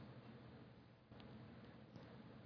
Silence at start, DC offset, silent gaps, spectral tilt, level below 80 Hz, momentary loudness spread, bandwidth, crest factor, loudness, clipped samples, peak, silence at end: 0 s; under 0.1%; none; -6 dB/octave; -76 dBFS; 5 LU; 5.4 kHz; 16 dB; -61 LUFS; under 0.1%; -44 dBFS; 0 s